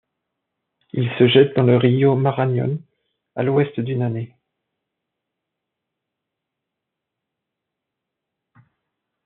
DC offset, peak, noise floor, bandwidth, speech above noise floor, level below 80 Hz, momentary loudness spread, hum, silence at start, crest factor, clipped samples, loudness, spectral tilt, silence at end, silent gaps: under 0.1%; -2 dBFS; -82 dBFS; 4.2 kHz; 65 dB; -68 dBFS; 16 LU; none; 0.95 s; 20 dB; under 0.1%; -18 LUFS; -6 dB/octave; 5 s; none